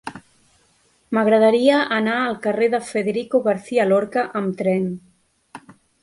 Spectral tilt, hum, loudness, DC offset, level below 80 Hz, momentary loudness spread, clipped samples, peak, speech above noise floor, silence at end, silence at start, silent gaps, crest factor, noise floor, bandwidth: -6 dB/octave; none; -19 LUFS; under 0.1%; -66 dBFS; 9 LU; under 0.1%; -4 dBFS; 42 dB; 0.45 s; 0.05 s; none; 18 dB; -60 dBFS; 11.5 kHz